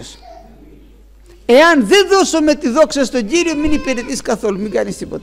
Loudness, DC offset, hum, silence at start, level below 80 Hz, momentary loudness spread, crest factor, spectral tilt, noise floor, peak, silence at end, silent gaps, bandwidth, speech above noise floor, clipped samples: -13 LUFS; under 0.1%; none; 0 s; -36 dBFS; 11 LU; 12 dB; -3.5 dB/octave; -42 dBFS; -2 dBFS; 0 s; none; 16 kHz; 29 dB; under 0.1%